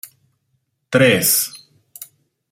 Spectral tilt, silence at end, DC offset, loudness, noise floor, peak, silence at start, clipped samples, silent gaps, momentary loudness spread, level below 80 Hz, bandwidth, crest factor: -3 dB/octave; 0.45 s; under 0.1%; -15 LUFS; -69 dBFS; 0 dBFS; 0.9 s; under 0.1%; none; 25 LU; -62 dBFS; 16.5 kHz; 20 dB